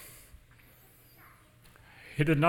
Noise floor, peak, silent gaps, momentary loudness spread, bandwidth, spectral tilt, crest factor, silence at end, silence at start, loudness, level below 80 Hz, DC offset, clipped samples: -59 dBFS; -10 dBFS; none; 26 LU; 17 kHz; -7 dB/octave; 24 dB; 0 s; 0 s; -33 LUFS; -58 dBFS; under 0.1%; under 0.1%